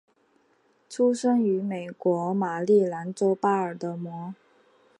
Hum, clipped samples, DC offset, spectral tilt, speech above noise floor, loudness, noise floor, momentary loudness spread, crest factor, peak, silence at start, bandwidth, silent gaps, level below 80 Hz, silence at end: none; under 0.1%; under 0.1%; -7 dB/octave; 41 dB; -25 LUFS; -65 dBFS; 13 LU; 16 dB; -10 dBFS; 0.9 s; 11 kHz; none; -78 dBFS; 0.65 s